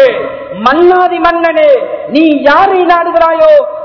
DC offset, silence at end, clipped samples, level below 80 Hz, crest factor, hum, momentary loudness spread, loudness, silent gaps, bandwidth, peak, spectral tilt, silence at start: under 0.1%; 0 s; 5%; -42 dBFS; 8 dB; none; 6 LU; -8 LUFS; none; 5.4 kHz; 0 dBFS; -6 dB/octave; 0 s